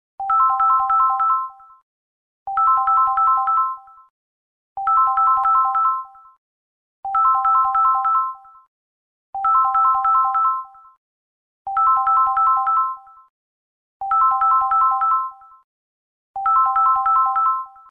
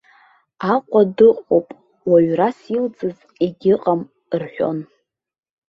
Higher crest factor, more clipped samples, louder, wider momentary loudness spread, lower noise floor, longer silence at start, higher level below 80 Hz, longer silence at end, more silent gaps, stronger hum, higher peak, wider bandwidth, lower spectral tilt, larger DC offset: about the same, 12 dB vs 16 dB; neither; about the same, -17 LUFS vs -18 LUFS; about the same, 12 LU vs 14 LU; first, under -90 dBFS vs -54 dBFS; second, 0.2 s vs 0.6 s; about the same, -58 dBFS vs -62 dBFS; second, 0.2 s vs 0.85 s; first, 1.82-2.46 s, 4.10-4.76 s, 6.38-7.03 s, 8.68-9.33 s, 10.97-11.65 s, 13.30-14.00 s, 15.64-16.34 s vs none; neither; second, -8 dBFS vs -2 dBFS; second, 3.4 kHz vs 5.8 kHz; second, -3.5 dB/octave vs -9 dB/octave; neither